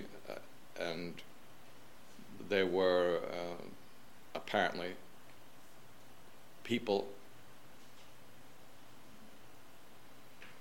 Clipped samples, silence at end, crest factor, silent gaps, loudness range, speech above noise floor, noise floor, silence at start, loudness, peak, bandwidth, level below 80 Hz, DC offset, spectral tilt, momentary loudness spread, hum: under 0.1%; 0 s; 24 dB; none; 9 LU; 26 dB; -60 dBFS; 0 s; -37 LUFS; -18 dBFS; 17 kHz; -76 dBFS; 0.4%; -5 dB/octave; 26 LU; none